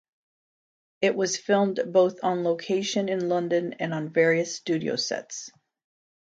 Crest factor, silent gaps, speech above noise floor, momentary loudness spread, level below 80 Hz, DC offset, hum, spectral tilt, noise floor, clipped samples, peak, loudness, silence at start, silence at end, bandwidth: 18 dB; none; over 65 dB; 8 LU; -76 dBFS; under 0.1%; none; -4.5 dB/octave; under -90 dBFS; under 0.1%; -8 dBFS; -25 LUFS; 1 s; 0.75 s; 9.2 kHz